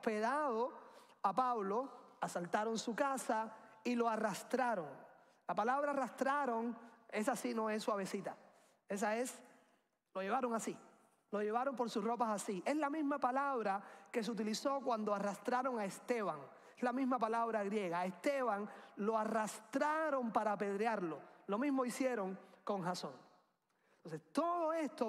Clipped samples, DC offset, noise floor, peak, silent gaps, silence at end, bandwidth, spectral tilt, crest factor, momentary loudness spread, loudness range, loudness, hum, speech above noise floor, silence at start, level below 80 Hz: under 0.1%; under 0.1%; -78 dBFS; -22 dBFS; none; 0 s; 15.5 kHz; -4.5 dB/octave; 18 dB; 9 LU; 3 LU; -39 LUFS; none; 40 dB; 0 s; under -90 dBFS